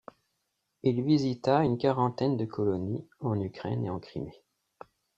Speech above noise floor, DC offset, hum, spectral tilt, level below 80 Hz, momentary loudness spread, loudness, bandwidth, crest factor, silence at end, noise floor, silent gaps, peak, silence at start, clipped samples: 51 dB; under 0.1%; none; -8.5 dB/octave; -64 dBFS; 11 LU; -29 LUFS; 7.8 kHz; 20 dB; 0.85 s; -80 dBFS; none; -10 dBFS; 0.85 s; under 0.1%